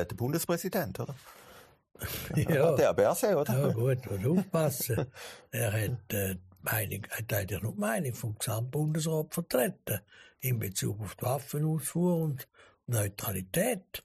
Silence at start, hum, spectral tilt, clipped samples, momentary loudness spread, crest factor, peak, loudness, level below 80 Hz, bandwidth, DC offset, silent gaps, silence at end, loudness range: 0 s; none; -5.5 dB/octave; under 0.1%; 11 LU; 18 dB; -14 dBFS; -31 LUFS; -60 dBFS; 15.5 kHz; under 0.1%; none; 0.05 s; 5 LU